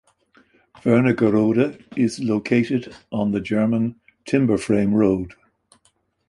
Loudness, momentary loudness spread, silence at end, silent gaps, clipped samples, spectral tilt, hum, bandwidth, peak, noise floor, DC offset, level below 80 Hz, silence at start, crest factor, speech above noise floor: -20 LUFS; 9 LU; 1 s; none; under 0.1%; -7.5 dB/octave; none; 11.5 kHz; -4 dBFS; -65 dBFS; under 0.1%; -52 dBFS; 0.85 s; 18 dB; 45 dB